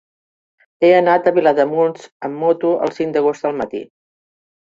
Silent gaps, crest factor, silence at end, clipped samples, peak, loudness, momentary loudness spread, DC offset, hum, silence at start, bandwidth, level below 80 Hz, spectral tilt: 2.12-2.20 s; 16 dB; 0.85 s; under 0.1%; -2 dBFS; -16 LUFS; 13 LU; under 0.1%; none; 0.8 s; 7.6 kHz; -64 dBFS; -6.5 dB/octave